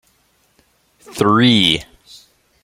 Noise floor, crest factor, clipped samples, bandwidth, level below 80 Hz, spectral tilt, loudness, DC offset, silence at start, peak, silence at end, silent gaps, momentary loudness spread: -59 dBFS; 18 dB; under 0.1%; 16 kHz; -50 dBFS; -5 dB/octave; -14 LUFS; under 0.1%; 1.1 s; 0 dBFS; 0.8 s; none; 11 LU